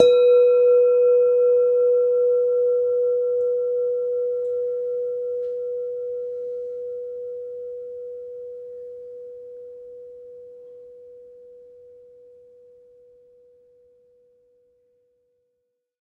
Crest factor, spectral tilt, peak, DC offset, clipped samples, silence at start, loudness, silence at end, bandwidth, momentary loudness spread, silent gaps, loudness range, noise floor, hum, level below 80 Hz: 22 dB; -4 dB/octave; 0 dBFS; under 0.1%; under 0.1%; 0 s; -21 LUFS; 4.45 s; 4.1 kHz; 24 LU; none; 24 LU; -76 dBFS; none; -70 dBFS